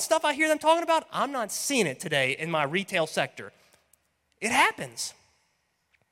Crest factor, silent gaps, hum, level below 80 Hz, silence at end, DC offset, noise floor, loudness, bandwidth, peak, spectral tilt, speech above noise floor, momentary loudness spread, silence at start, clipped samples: 20 dB; none; none; -70 dBFS; 1 s; under 0.1%; -73 dBFS; -26 LUFS; 16.5 kHz; -8 dBFS; -3 dB/octave; 47 dB; 11 LU; 0 s; under 0.1%